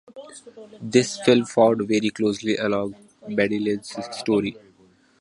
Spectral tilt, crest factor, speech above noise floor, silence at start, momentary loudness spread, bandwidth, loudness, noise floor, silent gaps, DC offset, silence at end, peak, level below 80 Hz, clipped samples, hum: -5 dB/octave; 20 dB; 35 dB; 0.1 s; 21 LU; 11.5 kHz; -22 LUFS; -57 dBFS; none; under 0.1%; 0.65 s; -2 dBFS; -62 dBFS; under 0.1%; none